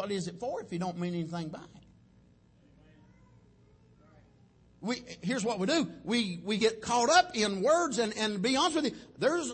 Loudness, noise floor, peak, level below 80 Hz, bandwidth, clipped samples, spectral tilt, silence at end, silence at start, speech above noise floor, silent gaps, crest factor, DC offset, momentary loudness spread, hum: -30 LUFS; -62 dBFS; -12 dBFS; -66 dBFS; 8.8 kHz; under 0.1%; -4 dB/octave; 0 s; 0 s; 32 dB; none; 20 dB; under 0.1%; 12 LU; none